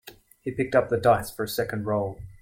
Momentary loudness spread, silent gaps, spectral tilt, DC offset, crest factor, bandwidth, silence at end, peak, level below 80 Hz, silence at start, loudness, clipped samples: 12 LU; none; -5.5 dB/octave; under 0.1%; 18 dB; 16.5 kHz; 0.05 s; -8 dBFS; -52 dBFS; 0.05 s; -26 LUFS; under 0.1%